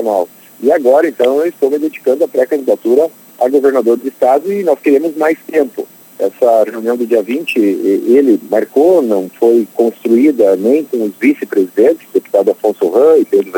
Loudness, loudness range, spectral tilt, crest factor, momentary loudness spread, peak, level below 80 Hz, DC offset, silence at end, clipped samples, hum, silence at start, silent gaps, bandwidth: -12 LUFS; 2 LU; -6 dB/octave; 12 dB; 6 LU; 0 dBFS; -64 dBFS; under 0.1%; 0 s; under 0.1%; none; 0 s; none; 19 kHz